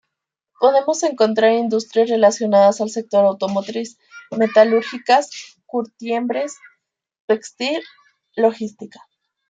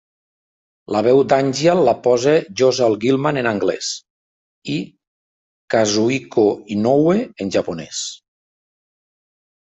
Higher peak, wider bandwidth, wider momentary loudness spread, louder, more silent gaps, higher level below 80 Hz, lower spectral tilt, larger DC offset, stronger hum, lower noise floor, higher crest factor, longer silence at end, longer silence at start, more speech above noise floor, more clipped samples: about the same, -2 dBFS vs -2 dBFS; about the same, 9.2 kHz vs 8.4 kHz; first, 16 LU vs 11 LU; about the same, -18 LUFS vs -17 LUFS; second, 7.20-7.28 s vs 4.10-4.62 s, 5.07-5.68 s; second, -72 dBFS vs -58 dBFS; about the same, -4 dB/octave vs -5 dB/octave; neither; neither; second, -81 dBFS vs under -90 dBFS; about the same, 18 dB vs 16 dB; second, 0.65 s vs 1.45 s; second, 0.6 s vs 0.9 s; second, 63 dB vs over 73 dB; neither